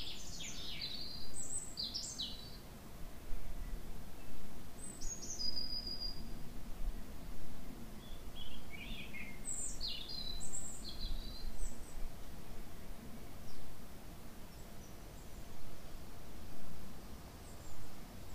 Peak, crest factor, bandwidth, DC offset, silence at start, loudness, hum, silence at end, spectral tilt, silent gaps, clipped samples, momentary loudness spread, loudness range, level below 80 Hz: -22 dBFS; 14 dB; 15.5 kHz; under 0.1%; 0 s; -47 LUFS; none; 0 s; -2.5 dB/octave; none; under 0.1%; 13 LU; 10 LU; -48 dBFS